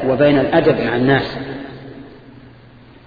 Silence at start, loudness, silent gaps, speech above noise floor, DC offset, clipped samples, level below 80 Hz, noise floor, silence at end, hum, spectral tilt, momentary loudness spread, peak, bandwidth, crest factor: 0 s; -15 LUFS; none; 29 dB; under 0.1%; under 0.1%; -44 dBFS; -43 dBFS; 0.9 s; none; -9 dB/octave; 22 LU; 0 dBFS; 5 kHz; 18 dB